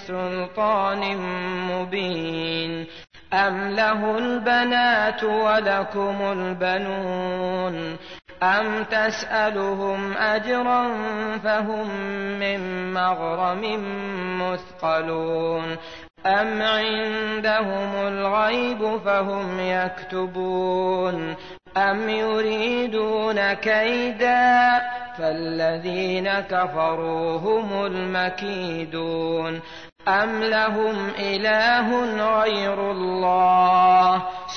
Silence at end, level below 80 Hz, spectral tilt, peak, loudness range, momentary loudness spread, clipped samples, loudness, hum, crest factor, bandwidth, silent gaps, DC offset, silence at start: 0 s; -58 dBFS; -5.5 dB/octave; -8 dBFS; 4 LU; 9 LU; under 0.1%; -22 LUFS; none; 14 dB; 6.6 kHz; 29.92-29.96 s; 0.3%; 0 s